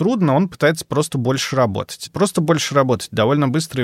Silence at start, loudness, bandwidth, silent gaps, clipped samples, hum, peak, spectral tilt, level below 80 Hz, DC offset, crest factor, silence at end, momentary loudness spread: 0 s; -18 LUFS; 16 kHz; none; under 0.1%; none; -2 dBFS; -5.5 dB/octave; -54 dBFS; under 0.1%; 16 dB; 0 s; 4 LU